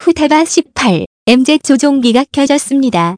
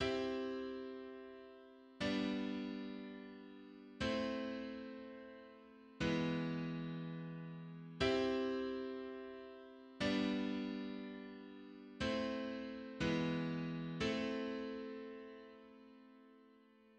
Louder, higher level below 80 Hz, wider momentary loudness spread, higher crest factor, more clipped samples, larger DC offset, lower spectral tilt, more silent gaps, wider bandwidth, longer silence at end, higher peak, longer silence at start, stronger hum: first, -11 LUFS vs -42 LUFS; first, -46 dBFS vs -66 dBFS; second, 4 LU vs 19 LU; second, 10 dB vs 18 dB; first, 0.6% vs under 0.1%; neither; second, -4 dB/octave vs -6 dB/octave; first, 1.06-1.26 s vs none; first, 11 kHz vs 9.4 kHz; about the same, 0 s vs 0.05 s; first, 0 dBFS vs -24 dBFS; about the same, 0 s vs 0 s; neither